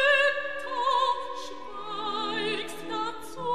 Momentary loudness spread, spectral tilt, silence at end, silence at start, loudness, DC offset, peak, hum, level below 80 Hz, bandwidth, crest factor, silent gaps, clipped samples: 13 LU; -2.5 dB/octave; 0 s; 0 s; -28 LUFS; 0.9%; -12 dBFS; none; -66 dBFS; 14.5 kHz; 16 dB; none; under 0.1%